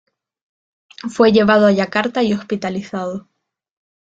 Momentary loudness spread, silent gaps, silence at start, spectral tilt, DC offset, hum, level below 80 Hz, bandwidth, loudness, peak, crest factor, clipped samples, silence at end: 16 LU; none; 1.05 s; -6 dB/octave; under 0.1%; none; -56 dBFS; 7.8 kHz; -16 LUFS; -2 dBFS; 18 dB; under 0.1%; 0.95 s